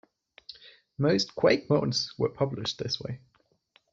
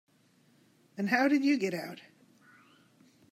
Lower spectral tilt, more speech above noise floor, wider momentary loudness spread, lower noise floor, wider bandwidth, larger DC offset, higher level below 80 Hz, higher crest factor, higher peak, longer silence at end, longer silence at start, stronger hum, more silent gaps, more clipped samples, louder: about the same, -4.5 dB/octave vs -5.5 dB/octave; about the same, 40 dB vs 38 dB; about the same, 22 LU vs 22 LU; about the same, -67 dBFS vs -66 dBFS; second, 7.8 kHz vs 14.5 kHz; neither; first, -64 dBFS vs -86 dBFS; about the same, 22 dB vs 20 dB; first, -8 dBFS vs -14 dBFS; second, 0.75 s vs 1.3 s; second, 0.5 s vs 0.95 s; neither; neither; neither; about the same, -27 LUFS vs -29 LUFS